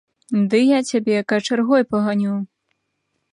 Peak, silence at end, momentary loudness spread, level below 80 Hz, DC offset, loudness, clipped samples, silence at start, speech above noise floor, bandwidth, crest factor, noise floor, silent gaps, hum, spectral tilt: -4 dBFS; 0.9 s; 8 LU; -66 dBFS; under 0.1%; -19 LUFS; under 0.1%; 0.3 s; 55 dB; 11 kHz; 14 dB; -73 dBFS; none; none; -5.5 dB/octave